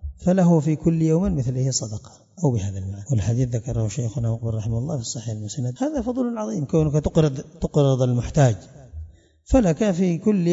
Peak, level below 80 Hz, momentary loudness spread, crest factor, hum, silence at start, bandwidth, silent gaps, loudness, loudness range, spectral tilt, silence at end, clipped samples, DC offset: -4 dBFS; -40 dBFS; 11 LU; 18 dB; none; 0 s; 7.8 kHz; none; -22 LUFS; 4 LU; -7 dB/octave; 0 s; under 0.1%; under 0.1%